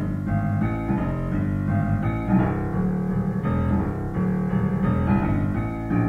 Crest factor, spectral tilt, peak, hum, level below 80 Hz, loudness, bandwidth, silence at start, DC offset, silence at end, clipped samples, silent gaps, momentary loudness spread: 14 dB; -10 dB/octave; -8 dBFS; none; -34 dBFS; -24 LUFS; 4.1 kHz; 0 s; under 0.1%; 0 s; under 0.1%; none; 4 LU